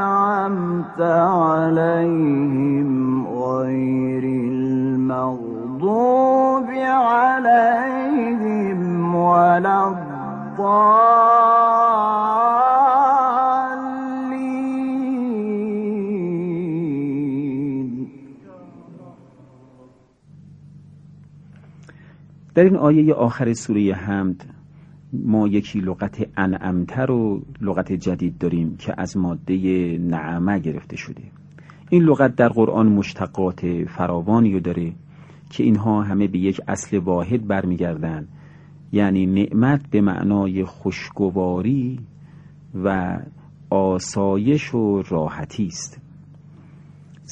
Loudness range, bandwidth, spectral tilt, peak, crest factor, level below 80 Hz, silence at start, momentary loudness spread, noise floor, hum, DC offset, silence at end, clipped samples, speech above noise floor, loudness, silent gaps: 8 LU; 9.2 kHz; -7.5 dB/octave; 0 dBFS; 18 dB; -54 dBFS; 0 s; 12 LU; -51 dBFS; none; under 0.1%; 0 s; under 0.1%; 32 dB; -19 LUFS; none